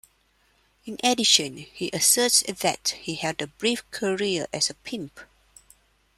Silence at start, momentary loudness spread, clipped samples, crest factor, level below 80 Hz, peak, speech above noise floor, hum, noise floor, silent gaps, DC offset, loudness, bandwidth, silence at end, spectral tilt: 0.85 s; 16 LU; under 0.1%; 24 dB; -64 dBFS; -2 dBFS; 40 dB; none; -65 dBFS; none; under 0.1%; -23 LUFS; 16 kHz; 0.95 s; -1.5 dB/octave